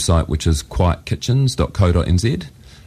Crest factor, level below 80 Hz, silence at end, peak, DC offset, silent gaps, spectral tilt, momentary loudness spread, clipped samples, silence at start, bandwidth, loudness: 14 dB; -26 dBFS; 0.35 s; -2 dBFS; under 0.1%; none; -6 dB/octave; 6 LU; under 0.1%; 0 s; 14.5 kHz; -18 LUFS